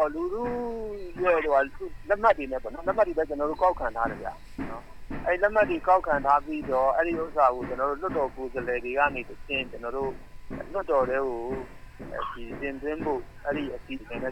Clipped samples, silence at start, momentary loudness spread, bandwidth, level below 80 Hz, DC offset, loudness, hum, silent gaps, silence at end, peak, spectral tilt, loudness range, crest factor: under 0.1%; 0 s; 14 LU; 13 kHz; -44 dBFS; under 0.1%; -27 LUFS; none; none; 0 s; -8 dBFS; -6.5 dB/octave; 6 LU; 20 dB